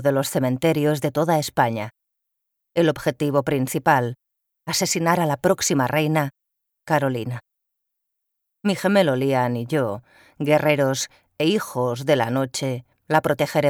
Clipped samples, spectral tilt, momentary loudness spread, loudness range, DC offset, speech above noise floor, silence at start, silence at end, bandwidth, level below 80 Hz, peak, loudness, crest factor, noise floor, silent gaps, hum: under 0.1%; -5 dB/octave; 9 LU; 3 LU; under 0.1%; 58 dB; 0 s; 0 s; 20 kHz; -60 dBFS; -4 dBFS; -22 LUFS; 18 dB; -79 dBFS; none; none